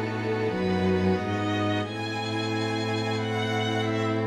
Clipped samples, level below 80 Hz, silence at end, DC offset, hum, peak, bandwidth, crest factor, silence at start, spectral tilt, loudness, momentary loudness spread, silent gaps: under 0.1%; -58 dBFS; 0 s; under 0.1%; none; -14 dBFS; 11.5 kHz; 14 dB; 0 s; -6 dB/octave; -27 LUFS; 4 LU; none